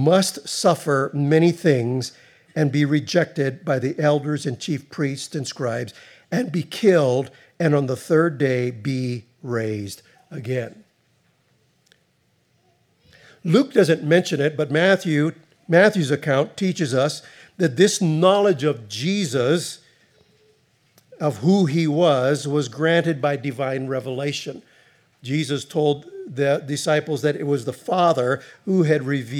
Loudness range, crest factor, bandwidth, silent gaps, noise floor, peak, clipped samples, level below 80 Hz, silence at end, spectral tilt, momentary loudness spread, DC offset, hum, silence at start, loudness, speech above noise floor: 7 LU; 20 dB; 15 kHz; none; -65 dBFS; -2 dBFS; under 0.1%; -76 dBFS; 0 s; -5.5 dB/octave; 11 LU; under 0.1%; none; 0 s; -21 LUFS; 45 dB